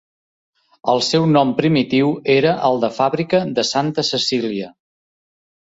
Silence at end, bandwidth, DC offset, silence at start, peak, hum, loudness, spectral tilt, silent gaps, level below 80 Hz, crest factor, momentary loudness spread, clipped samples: 1.05 s; 8 kHz; under 0.1%; 0.85 s; -2 dBFS; none; -17 LUFS; -5 dB/octave; none; -60 dBFS; 16 dB; 7 LU; under 0.1%